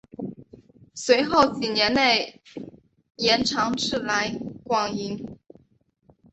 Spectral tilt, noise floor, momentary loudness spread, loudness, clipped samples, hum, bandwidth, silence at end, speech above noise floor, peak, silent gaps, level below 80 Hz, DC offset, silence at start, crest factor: -3 dB/octave; -64 dBFS; 21 LU; -22 LUFS; under 0.1%; none; 8.2 kHz; 1 s; 41 dB; -4 dBFS; none; -56 dBFS; under 0.1%; 0.2 s; 22 dB